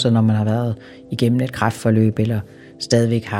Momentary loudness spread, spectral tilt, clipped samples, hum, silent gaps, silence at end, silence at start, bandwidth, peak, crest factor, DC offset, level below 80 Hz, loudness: 14 LU; -6.5 dB/octave; under 0.1%; none; none; 0 s; 0 s; 14 kHz; -2 dBFS; 18 dB; under 0.1%; -54 dBFS; -19 LUFS